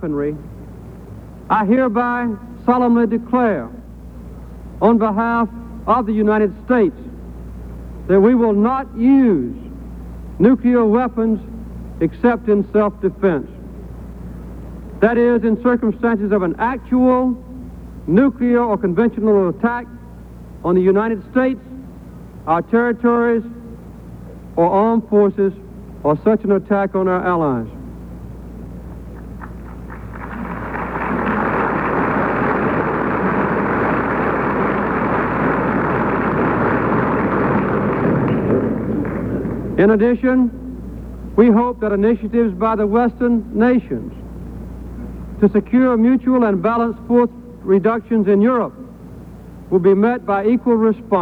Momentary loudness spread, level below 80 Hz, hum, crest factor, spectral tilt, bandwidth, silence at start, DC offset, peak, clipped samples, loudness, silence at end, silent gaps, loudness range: 20 LU; -38 dBFS; none; 16 dB; -9.5 dB/octave; 4.6 kHz; 0 s; under 0.1%; -2 dBFS; under 0.1%; -17 LUFS; 0 s; none; 4 LU